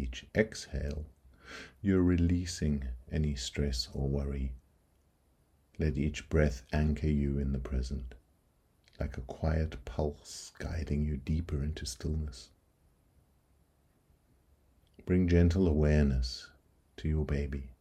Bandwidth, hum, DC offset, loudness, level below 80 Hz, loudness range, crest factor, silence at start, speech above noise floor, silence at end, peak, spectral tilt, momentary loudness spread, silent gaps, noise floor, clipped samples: 12.5 kHz; none; under 0.1%; -33 LUFS; -40 dBFS; 7 LU; 22 dB; 0 s; 38 dB; 0.1 s; -10 dBFS; -6.5 dB/octave; 15 LU; none; -70 dBFS; under 0.1%